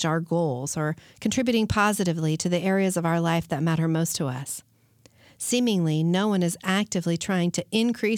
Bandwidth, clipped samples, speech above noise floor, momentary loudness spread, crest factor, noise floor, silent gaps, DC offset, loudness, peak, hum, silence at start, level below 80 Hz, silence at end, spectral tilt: 18 kHz; under 0.1%; 34 dB; 6 LU; 16 dB; -59 dBFS; none; under 0.1%; -25 LUFS; -10 dBFS; none; 0 s; -56 dBFS; 0 s; -5 dB/octave